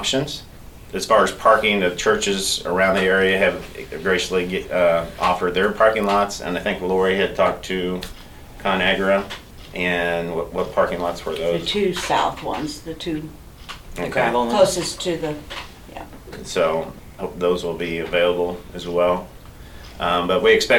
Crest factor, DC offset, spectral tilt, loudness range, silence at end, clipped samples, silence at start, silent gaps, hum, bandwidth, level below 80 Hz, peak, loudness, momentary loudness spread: 18 dB; under 0.1%; -4 dB/octave; 5 LU; 0 s; under 0.1%; 0 s; none; none; 19 kHz; -42 dBFS; -2 dBFS; -20 LUFS; 17 LU